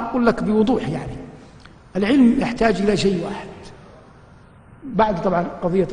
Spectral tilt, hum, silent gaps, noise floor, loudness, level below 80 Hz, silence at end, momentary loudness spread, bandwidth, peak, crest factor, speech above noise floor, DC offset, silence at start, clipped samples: -6.5 dB/octave; none; none; -46 dBFS; -19 LUFS; -42 dBFS; 0 s; 20 LU; 10 kHz; -2 dBFS; 18 dB; 28 dB; under 0.1%; 0 s; under 0.1%